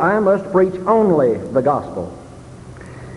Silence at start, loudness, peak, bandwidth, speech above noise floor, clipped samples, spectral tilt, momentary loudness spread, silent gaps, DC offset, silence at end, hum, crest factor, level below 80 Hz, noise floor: 0 s; -16 LUFS; -2 dBFS; 11.5 kHz; 21 dB; under 0.1%; -8.5 dB/octave; 22 LU; none; under 0.1%; 0 s; none; 16 dB; -46 dBFS; -37 dBFS